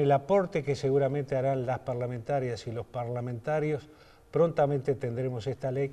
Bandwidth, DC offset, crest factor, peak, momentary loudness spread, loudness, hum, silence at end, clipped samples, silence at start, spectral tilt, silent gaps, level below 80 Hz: 10 kHz; under 0.1%; 16 dB; -12 dBFS; 9 LU; -30 LUFS; none; 0 s; under 0.1%; 0 s; -8 dB/octave; none; -60 dBFS